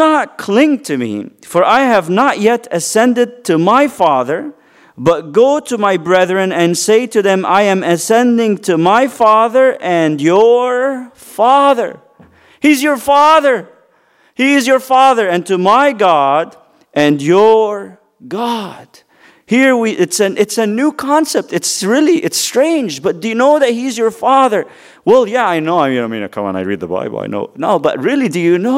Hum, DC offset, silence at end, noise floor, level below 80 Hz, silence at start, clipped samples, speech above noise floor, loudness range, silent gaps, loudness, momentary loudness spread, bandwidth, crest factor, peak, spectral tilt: none; under 0.1%; 0 s; -53 dBFS; -60 dBFS; 0 s; under 0.1%; 41 dB; 3 LU; none; -12 LUFS; 10 LU; 16 kHz; 12 dB; 0 dBFS; -4.5 dB/octave